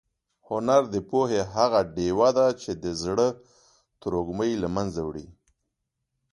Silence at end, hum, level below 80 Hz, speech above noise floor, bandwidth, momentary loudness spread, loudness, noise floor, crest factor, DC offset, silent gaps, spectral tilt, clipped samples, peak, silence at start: 1 s; none; -52 dBFS; 56 dB; 11.5 kHz; 11 LU; -25 LUFS; -81 dBFS; 20 dB; under 0.1%; none; -5.5 dB/octave; under 0.1%; -6 dBFS; 0.5 s